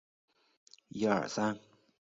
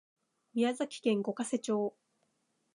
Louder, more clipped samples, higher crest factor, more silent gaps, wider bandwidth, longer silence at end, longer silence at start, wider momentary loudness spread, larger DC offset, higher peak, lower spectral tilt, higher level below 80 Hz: about the same, -33 LUFS vs -34 LUFS; neither; about the same, 22 dB vs 18 dB; neither; second, 7.6 kHz vs 11 kHz; second, 0.55 s vs 0.85 s; first, 0.95 s vs 0.55 s; first, 15 LU vs 5 LU; neither; about the same, -16 dBFS vs -16 dBFS; about the same, -4.5 dB/octave vs -5 dB/octave; first, -74 dBFS vs -88 dBFS